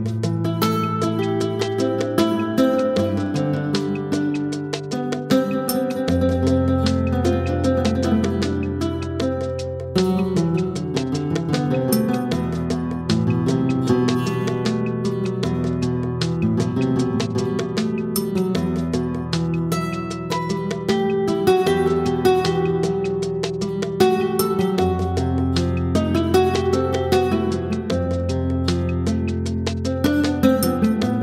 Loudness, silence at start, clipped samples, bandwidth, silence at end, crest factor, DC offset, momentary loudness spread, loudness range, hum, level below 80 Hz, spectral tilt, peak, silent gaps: -21 LUFS; 0 s; under 0.1%; 16 kHz; 0 s; 16 dB; under 0.1%; 6 LU; 2 LU; none; -40 dBFS; -6.5 dB/octave; -4 dBFS; none